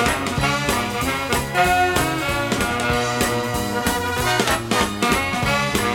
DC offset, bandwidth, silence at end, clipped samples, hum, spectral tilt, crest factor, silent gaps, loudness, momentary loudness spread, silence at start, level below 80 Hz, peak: under 0.1%; over 20 kHz; 0 s; under 0.1%; none; -3.5 dB/octave; 18 dB; none; -20 LUFS; 4 LU; 0 s; -36 dBFS; -4 dBFS